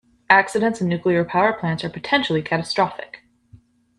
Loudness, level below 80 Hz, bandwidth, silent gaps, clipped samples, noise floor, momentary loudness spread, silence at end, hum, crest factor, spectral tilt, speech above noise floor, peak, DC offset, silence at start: -20 LUFS; -58 dBFS; 11.5 kHz; none; under 0.1%; -52 dBFS; 9 LU; 0.4 s; none; 20 dB; -5.5 dB/octave; 32 dB; 0 dBFS; under 0.1%; 0.3 s